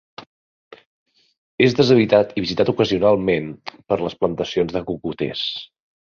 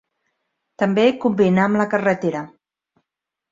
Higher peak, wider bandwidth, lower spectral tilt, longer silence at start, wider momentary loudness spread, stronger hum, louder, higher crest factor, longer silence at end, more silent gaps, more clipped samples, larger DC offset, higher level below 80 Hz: about the same, -2 dBFS vs -4 dBFS; about the same, 7.2 kHz vs 7.6 kHz; about the same, -6.5 dB/octave vs -7 dB/octave; second, 0.2 s vs 0.8 s; about the same, 11 LU vs 9 LU; neither; about the same, -19 LUFS vs -18 LUFS; about the same, 18 dB vs 18 dB; second, 0.5 s vs 1.05 s; first, 0.26-0.71 s, 0.86-1.06 s, 1.38-1.58 s vs none; neither; neither; first, -52 dBFS vs -60 dBFS